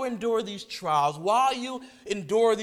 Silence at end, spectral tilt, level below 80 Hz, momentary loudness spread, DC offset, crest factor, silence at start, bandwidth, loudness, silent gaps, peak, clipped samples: 0 s; -4 dB/octave; -66 dBFS; 11 LU; under 0.1%; 16 dB; 0 s; 15 kHz; -26 LUFS; none; -10 dBFS; under 0.1%